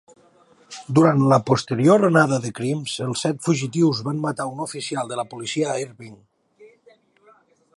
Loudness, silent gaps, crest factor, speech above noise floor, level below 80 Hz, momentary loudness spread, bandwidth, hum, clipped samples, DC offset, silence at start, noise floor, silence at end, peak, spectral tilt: -21 LUFS; none; 20 dB; 36 dB; -64 dBFS; 12 LU; 11.5 kHz; none; under 0.1%; under 0.1%; 0.7 s; -56 dBFS; 1.1 s; -2 dBFS; -6 dB/octave